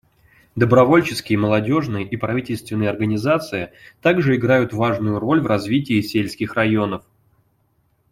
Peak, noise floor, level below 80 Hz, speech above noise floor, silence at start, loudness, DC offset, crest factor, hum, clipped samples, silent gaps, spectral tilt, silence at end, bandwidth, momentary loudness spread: -2 dBFS; -64 dBFS; -52 dBFS; 45 dB; 0.55 s; -19 LUFS; under 0.1%; 18 dB; none; under 0.1%; none; -7 dB/octave; 1.15 s; 16 kHz; 10 LU